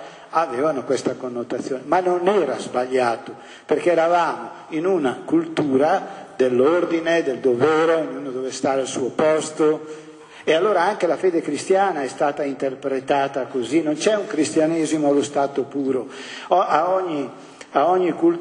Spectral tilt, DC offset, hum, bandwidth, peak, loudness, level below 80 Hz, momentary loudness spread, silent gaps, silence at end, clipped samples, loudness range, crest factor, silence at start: -5 dB/octave; under 0.1%; none; 10.5 kHz; -2 dBFS; -21 LUFS; -70 dBFS; 10 LU; none; 0 s; under 0.1%; 2 LU; 18 dB; 0 s